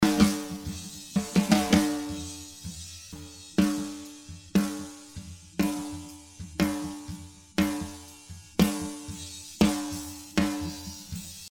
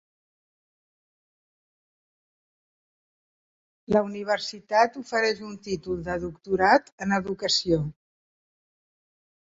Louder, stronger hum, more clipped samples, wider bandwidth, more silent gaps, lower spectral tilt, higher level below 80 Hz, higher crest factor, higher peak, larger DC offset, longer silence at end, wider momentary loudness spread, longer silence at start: second, -29 LUFS vs -25 LUFS; neither; neither; first, 17.5 kHz vs 8 kHz; second, none vs 6.92-6.98 s; about the same, -5 dB/octave vs -4.5 dB/octave; first, -48 dBFS vs -56 dBFS; about the same, 22 dB vs 22 dB; about the same, -6 dBFS vs -6 dBFS; neither; second, 0.05 s vs 1.65 s; first, 19 LU vs 11 LU; second, 0 s vs 3.9 s